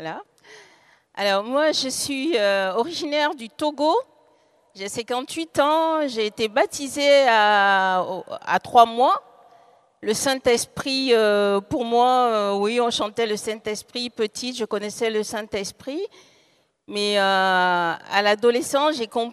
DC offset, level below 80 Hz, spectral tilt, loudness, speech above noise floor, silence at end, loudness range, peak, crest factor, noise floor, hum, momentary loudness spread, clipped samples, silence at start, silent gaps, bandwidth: under 0.1%; -64 dBFS; -3 dB/octave; -21 LUFS; 41 dB; 0 s; 6 LU; -2 dBFS; 20 dB; -62 dBFS; none; 12 LU; under 0.1%; 0 s; none; 14.5 kHz